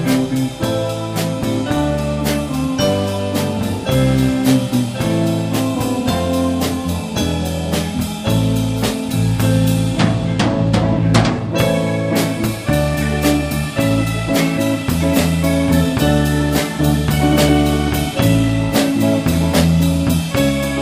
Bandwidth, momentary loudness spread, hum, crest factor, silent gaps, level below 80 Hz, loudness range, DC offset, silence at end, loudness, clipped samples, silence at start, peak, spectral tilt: 15.5 kHz; 5 LU; none; 16 dB; none; -30 dBFS; 3 LU; under 0.1%; 0 s; -17 LUFS; under 0.1%; 0 s; 0 dBFS; -6 dB/octave